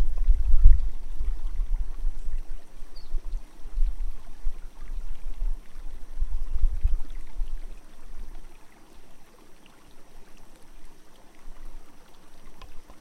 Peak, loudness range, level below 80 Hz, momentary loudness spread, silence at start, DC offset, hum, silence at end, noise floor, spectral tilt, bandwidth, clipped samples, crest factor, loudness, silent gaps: -2 dBFS; 22 LU; -26 dBFS; 26 LU; 0 s; under 0.1%; none; 0 s; -46 dBFS; -6.5 dB/octave; 2.1 kHz; under 0.1%; 20 dB; -33 LUFS; none